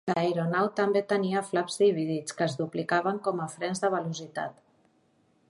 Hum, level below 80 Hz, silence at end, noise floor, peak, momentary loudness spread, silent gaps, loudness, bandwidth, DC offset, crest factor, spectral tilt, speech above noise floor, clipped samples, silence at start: none; -76 dBFS; 1 s; -67 dBFS; -12 dBFS; 9 LU; none; -28 LUFS; 11.5 kHz; under 0.1%; 18 dB; -5.5 dB/octave; 39 dB; under 0.1%; 0.05 s